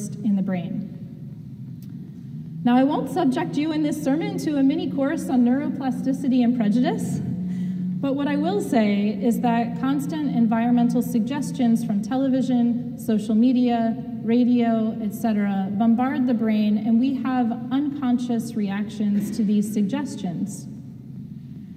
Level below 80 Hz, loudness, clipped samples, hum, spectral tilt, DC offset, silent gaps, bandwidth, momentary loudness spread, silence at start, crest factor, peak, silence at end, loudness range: -60 dBFS; -22 LUFS; under 0.1%; none; -7 dB/octave; under 0.1%; none; 15 kHz; 16 LU; 0 s; 14 dB; -8 dBFS; 0 s; 3 LU